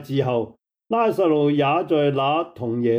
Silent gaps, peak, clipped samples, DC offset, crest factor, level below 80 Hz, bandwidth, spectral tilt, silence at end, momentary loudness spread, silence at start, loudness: none; -8 dBFS; under 0.1%; under 0.1%; 12 dB; -66 dBFS; 16 kHz; -8 dB/octave; 0 s; 7 LU; 0 s; -21 LUFS